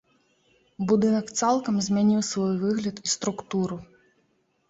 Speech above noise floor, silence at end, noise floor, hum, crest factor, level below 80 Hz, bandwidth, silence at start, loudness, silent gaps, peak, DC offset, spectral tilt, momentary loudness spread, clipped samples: 45 dB; 0.85 s; -69 dBFS; none; 16 dB; -62 dBFS; 8 kHz; 0.8 s; -25 LUFS; none; -10 dBFS; under 0.1%; -5 dB/octave; 7 LU; under 0.1%